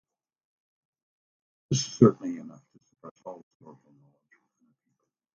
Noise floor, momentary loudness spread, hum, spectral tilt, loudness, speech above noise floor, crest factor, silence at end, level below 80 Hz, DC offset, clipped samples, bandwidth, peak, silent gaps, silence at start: -80 dBFS; 26 LU; none; -6 dB/octave; -25 LUFS; 55 dB; 28 dB; 2 s; -66 dBFS; under 0.1%; under 0.1%; 7.6 kHz; -4 dBFS; 3.11-3.15 s; 1.7 s